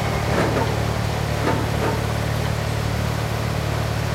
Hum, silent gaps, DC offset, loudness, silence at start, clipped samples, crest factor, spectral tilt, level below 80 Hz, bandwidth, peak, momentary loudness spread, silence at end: none; none; under 0.1%; -22 LUFS; 0 s; under 0.1%; 14 dB; -5.5 dB/octave; -32 dBFS; 16 kHz; -8 dBFS; 3 LU; 0 s